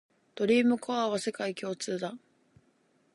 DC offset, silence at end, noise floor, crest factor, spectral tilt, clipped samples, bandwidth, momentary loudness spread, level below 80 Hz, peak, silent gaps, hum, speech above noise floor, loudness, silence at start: under 0.1%; 1 s; -69 dBFS; 18 dB; -4.5 dB/octave; under 0.1%; 11.5 kHz; 14 LU; -80 dBFS; -14 dBFS; none; none; 40 dB; -30 LUFS; 0.35 s